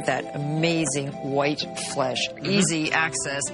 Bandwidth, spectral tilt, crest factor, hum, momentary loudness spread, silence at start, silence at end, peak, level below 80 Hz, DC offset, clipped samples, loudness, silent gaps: 11.5 kHz; -3.5 dB/octave; 18 dB; none; 7 LU; 0 s; 0 s; -8 dBFS; -58 dBFS; under 0.1%; under 0.1%; -24 LUFS; none